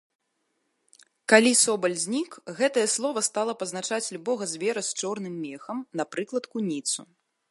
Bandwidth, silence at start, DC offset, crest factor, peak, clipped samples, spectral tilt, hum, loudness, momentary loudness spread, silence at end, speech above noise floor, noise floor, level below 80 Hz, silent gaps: 11.5 kHz; 1.3 s; under 0.1%; 24 dB; -2 dBFS; under 0.1%; -2.5 dB/octave; none; -26 LUFS; 14 LU; 0.45 s; 49 dB; -76 dBFS; -80 dBFS; none